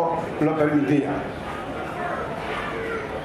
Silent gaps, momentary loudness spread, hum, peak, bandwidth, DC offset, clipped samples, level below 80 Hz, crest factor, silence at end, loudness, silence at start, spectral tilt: none; 10 LU; none; -8 dBFS; 13 kHz; under 0.1%; under 0.1%; -48 dBFS; 16 dB; 0 s; -25 LUFS; 0 s; -7 dB/octave